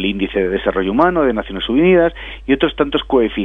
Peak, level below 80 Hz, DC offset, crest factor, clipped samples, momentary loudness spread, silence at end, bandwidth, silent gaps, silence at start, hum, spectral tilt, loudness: 0 dBFS; -34 dBFS; under 0.1%; 16 dB; under 0.1%; 6 LU; 0 s; 4.2 kHz; none; 0 s; none; -8 dB/octave; -16 LUFS